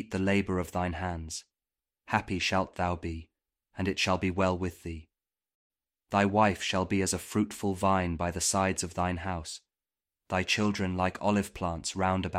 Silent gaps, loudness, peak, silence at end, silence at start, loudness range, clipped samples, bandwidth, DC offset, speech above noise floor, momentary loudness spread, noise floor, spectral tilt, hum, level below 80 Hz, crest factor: 5.55-5.70 s; -30 LUFS; -10 dBFS; 0 s; 0 s; 4 LU; under 0.1%; 16 kHz; under 0.1%; over 60 dB; 11 LU; under -90 dBFS; -4.5 dB/octave; none; -52 dBFS; 22 dB